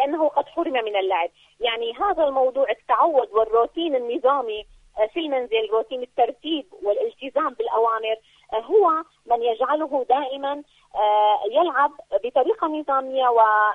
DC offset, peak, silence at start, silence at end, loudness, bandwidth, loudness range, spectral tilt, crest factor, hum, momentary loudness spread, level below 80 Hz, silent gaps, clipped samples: under 0.1%; -6 dBFS; 0 s; 0 s; -22 LUFS; 4.2 kHz; 3 LU; -4.5 dB/octave; 16 dB; none; 9 LU; -60 dBFS; none; under 0.1%